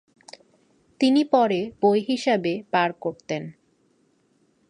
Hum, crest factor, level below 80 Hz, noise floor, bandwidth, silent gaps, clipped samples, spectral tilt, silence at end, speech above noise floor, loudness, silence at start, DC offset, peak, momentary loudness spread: none; 18 dB; -70 dBFS; -65 dBFS; 10.5 kHz; none; under 0.1%; -5.5 dB/octave; 1.2 s; 43 dB; -23 LUFS; 1 s; under 0.1%; -6 dBFS; 12 LU